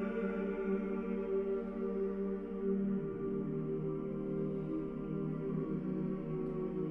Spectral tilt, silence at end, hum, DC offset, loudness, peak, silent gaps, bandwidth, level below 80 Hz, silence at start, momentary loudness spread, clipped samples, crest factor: -11 dB/octave; 0 s; none; under 0.1%; -38 LUFS; -24 dBFS; none; 3.7 kHz; -58 dBFS; 0 s; 3 LU; under 0.1%; 14 dB